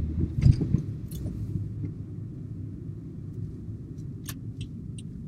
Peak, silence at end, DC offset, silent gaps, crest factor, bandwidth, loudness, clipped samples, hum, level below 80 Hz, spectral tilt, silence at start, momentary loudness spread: -6 dBFS; 0 s; under 0.1%; none; 24 dB; 15 kHz; -32 LUFS; under 0.1%; none; -38 dBFS; -8 dB/octave; 0 s; 16 LU